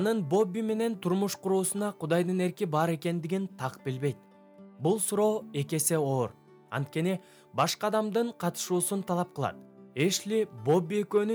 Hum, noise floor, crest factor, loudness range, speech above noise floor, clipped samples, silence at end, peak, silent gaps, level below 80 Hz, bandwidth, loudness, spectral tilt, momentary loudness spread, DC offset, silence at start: none; -53 dBFS; 16 dB; 1 LU; 24 dB; under 0.1%; 0 s; -12 dBFS; none; -76 dBFS; over 20 kHz; -30 LUFS; -5 dB/octave; 8 LU; under 0.1%; 0 s